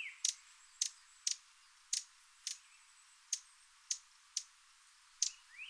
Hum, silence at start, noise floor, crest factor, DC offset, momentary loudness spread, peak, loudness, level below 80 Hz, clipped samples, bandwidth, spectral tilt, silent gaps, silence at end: none; 0 s; -66 dBFS; 28 dB; under 0.1%; 22 LU; -18 dBFS; -41 LUFS; -88 dBFS; under 0.1%; 11 kHz; 9 dB/octave; none; 0 s